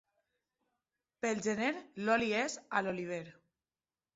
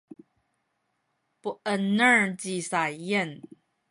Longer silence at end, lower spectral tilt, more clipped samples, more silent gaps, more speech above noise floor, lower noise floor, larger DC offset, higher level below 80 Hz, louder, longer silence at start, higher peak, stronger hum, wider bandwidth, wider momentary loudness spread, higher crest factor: first, 0.85 s vs 0.45 s; about the same, -3 dB/octave vs -4 dB/octave; neither; neither; first, over 55 dB vs 50 dB; first, under -90 dBFS vs -76 dBFS; neither; about the same, -76 dBFS vs -76 dBFS; second, -35 LUFS vs -25 LUFS; second, 1.25 s vs 1.45 s; second, -16 dBFS vs -8 dBFS; neither; second, 8 kHz vs 11.5 kHz; second, 10 LU vs 17 LU; about the same, 22 dB vs 20 dB